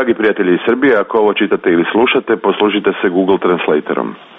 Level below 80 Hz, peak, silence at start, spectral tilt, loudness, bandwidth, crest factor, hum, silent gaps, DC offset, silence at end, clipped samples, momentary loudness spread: -54 dBFS; -2 dBFS; 0 s; -8.5 dB/octave; -13 LUFS; 3.9 kHz; 12 dB; none; none; under 0.1%; 0.15 s; under 0.1%; 3 LU